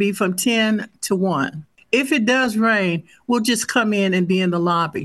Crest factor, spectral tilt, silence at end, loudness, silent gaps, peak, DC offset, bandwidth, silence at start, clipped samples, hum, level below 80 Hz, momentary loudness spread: 16 dB; -4.5 dB/octave; 0 s; -19 LUFS; none; -4 dBFS; under 0.1%; 12.5 kHz; 0 s; under 0.1%; none; -62 dBFS; 6 LU